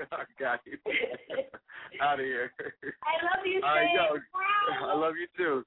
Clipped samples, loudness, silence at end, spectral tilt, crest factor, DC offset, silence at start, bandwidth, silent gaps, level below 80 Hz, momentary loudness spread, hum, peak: under 0.1%; -30 LUFS; 0 s; -7 dB/octave; 16 dB; under 0.1%; 0 s; 4.1 kHz; none; -70 dBFS; 13 LU; none; -14 dBFS